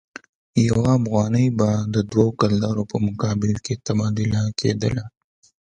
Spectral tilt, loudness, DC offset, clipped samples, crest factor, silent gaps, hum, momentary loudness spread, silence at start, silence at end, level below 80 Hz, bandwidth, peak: -7 dB/octave; -21 LUFS; under 0.1%; under 0.1%; 18 dB; none; none; 6 LU; 0.55 s; 0.65 s; -46 dBFS; 9.4 kHz; -2 dBFS